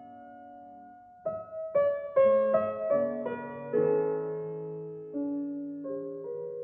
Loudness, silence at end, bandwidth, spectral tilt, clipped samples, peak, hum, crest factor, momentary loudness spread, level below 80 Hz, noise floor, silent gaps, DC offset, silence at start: -30 LUFS; 0 s; 3.5 kHz; -7.5 dB/octave; under 0.1%; -14 dBFS; none; 16 dB; 23 LU; -74 dBFS; -51 dBFS; none; under 0.1%; 0 s